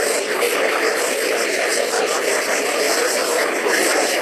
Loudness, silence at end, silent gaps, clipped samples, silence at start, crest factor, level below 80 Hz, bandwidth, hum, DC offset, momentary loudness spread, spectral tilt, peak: -18 LUFS; 0 s; none; under 0.1%; 0 s; 14 dB; -68 dBFS; 14.5 kHz; none; under 0.1%; 2 LU; 0 dB/octave; -6 dBFS